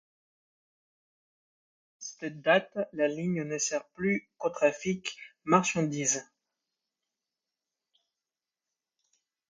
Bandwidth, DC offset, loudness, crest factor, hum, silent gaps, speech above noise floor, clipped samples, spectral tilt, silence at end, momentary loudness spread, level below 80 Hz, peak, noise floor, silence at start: 9.8 kHz; under 0.1%; -30 LUFS; 24 dB; none; none; over 61 dB; under 0.1%; -4 dB/octave; 3.25 s; 13 LU; -74 dBFS; -10 dBFS; under -90 dBFS; 2 s